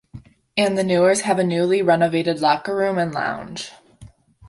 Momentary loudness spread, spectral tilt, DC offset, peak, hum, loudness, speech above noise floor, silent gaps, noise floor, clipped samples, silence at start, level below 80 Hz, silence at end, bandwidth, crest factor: 12 LU; -5 dB/octave; under 0.1%; -4 dBFS; none; -19 LUFS; 27 dB; none; -47 dBFS; under 0.1%; 0.15 s; -56 dBFS; 0.4 s; 11.5 kHz; 16 dB